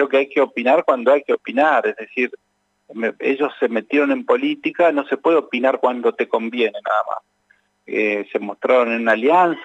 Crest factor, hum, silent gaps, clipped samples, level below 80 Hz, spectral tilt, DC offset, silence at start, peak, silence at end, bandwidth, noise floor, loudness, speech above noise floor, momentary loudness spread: 16 dB; none; none; under 0.1%; -82 dBFS; -6 dB/octave; under 0.1%; 0 s; -2 dBFS; 0 s; 8 kHz; -61 dBFS; -18 LUFS; 43 dB; 7 LU